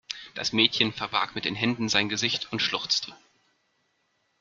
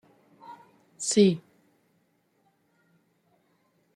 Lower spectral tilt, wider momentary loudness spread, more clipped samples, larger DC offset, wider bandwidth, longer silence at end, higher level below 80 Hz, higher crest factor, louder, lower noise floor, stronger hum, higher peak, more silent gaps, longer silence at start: second, -2.5 dB/octave vs -5 dB/octave; second, 7 LU vs 27 LU; neither; neither; second, 7.6 kHz vs 11.5 kHz; second, 1.25 s vs 2.55 s; first, -66 dBFS vs -74 dBFS; about the same, 26 dB vs 24 dB; about the same, -25 LUFS vs -24 LUFS; about the same, -73 dBFS vs -70 dBFS; neither; first, -4 dBFS vs -8 dBFS; neither; second, 0.1 s vs 0.5 s